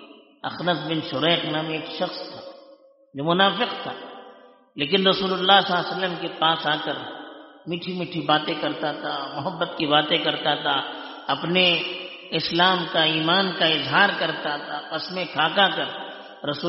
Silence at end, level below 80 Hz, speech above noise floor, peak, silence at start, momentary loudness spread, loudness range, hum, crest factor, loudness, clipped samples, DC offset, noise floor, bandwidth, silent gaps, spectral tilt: 0 s; -68 dBFS; 29 dB; -2 dBFS; 0 s; 15 LU; 5 LU; none; 22 dB; -22 LUFS; under 0.1%; under 0.1%; -52 dBFS; 6 kHz; none; -1.5 dB/octave